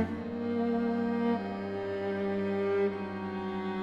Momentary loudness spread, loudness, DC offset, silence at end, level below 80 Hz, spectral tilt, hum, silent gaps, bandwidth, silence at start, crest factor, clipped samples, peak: 6 LU; -32 LUFS; under 0.1%; 0 s; -66 dBFS; -8.5 dB/octave; none; none; 7.6 kHz; 0 s; 12 dB; under 0.1%; -18 dBFS